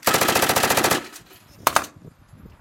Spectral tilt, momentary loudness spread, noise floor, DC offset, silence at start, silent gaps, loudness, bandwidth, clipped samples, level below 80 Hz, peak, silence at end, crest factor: -2 dB/octave; 12 LU; -47 dBFS; under 0.1%; 0.05 s; none; -20 LUFS; 17.5 kHz; under 0.1%; -52 dBFS; 0 dBFS; 0.15 s; 22 dB